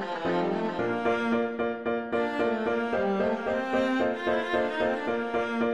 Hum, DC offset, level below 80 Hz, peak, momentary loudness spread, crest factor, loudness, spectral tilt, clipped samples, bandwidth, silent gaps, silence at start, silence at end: none; 0.2%; -60 dBFS; -14 dBFS; 3 LU; 14 dB; -28 LUFS; -6.5 dB/octave; under 0.1%; 10.5 kHz; none; 0 s; 0 s